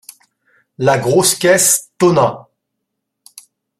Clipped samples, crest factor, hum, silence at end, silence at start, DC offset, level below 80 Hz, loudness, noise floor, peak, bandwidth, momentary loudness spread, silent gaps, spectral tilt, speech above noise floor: under 0.1%; 16 dB; none; 1.4 s; 0.8 s; under 0.1%; -54 dBFS; -13 LUFS; -75 dBFS; 0 dBFS; 15.5 kHz; 7 LU; none; -3.5 dB/octave; 62 dB